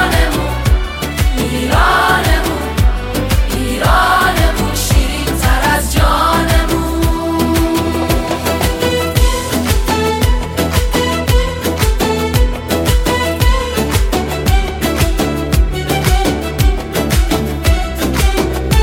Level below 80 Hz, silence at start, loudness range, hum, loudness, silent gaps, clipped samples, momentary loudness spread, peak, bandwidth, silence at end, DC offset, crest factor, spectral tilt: -16 dBFS; 0 s; 2 LU; none; -14 LUFS; none; under 0.1%; 5 LU; 0 dBFS; 17 kHz; 0 s; under 0.1%; 12 dB; -5 dB/octave